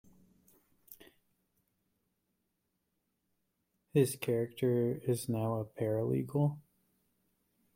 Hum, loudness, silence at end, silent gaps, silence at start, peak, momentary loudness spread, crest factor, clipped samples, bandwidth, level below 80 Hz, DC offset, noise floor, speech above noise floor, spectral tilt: none; -34 LUFS; 1.15 s; none; 0.9 s; -16 dBFS; 4 LU; 22 dB; under 0.1%; 16.5 kHz; -72 dBFS; under 0.1%; -83 dBFS; 50 dB; -7 dB/octave